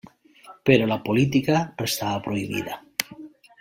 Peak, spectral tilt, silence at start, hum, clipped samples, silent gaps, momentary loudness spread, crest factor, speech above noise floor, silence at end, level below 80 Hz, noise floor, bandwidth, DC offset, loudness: 0 dBFS; -5 dB/octave; 0.45 s; none; under 0.1%; none; 10 LU; 24 dB; 27 dB; 0.3 s; -58 dBFS; -50 dBFS; 16.5 kHz; under 0.1%; -23 LUFS